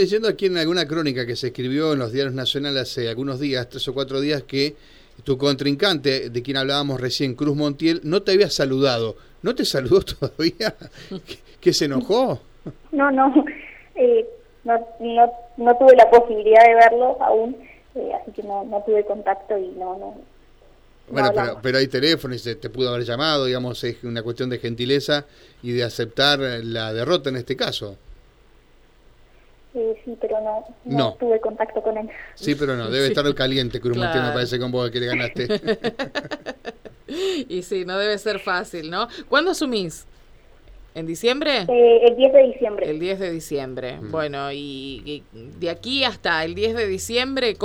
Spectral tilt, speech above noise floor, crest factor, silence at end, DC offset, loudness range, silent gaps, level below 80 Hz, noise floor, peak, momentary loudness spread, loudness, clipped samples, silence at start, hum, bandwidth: -5 dB/octave; 32 dB; 18 dB; 0 s; under 0.1%; 10 LU; none; -48 dBFS; -52 dBFS; -2 dBFS; 15 LU; -20 LUFS; under 0.1%; 0 s; none; 16.5 kHz